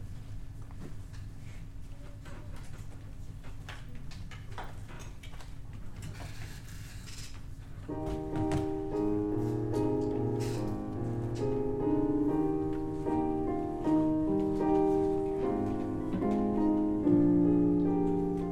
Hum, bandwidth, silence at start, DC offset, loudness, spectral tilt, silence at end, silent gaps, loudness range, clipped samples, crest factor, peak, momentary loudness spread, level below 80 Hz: none; 12.5 kHz; 0 s; under 0.1%; -31 LUFS; -8.5 dB/octave; 0 s; none; 18 LU; under 0.1%; 16 dB; -16 dBFS; 20 LU; -46 dBFS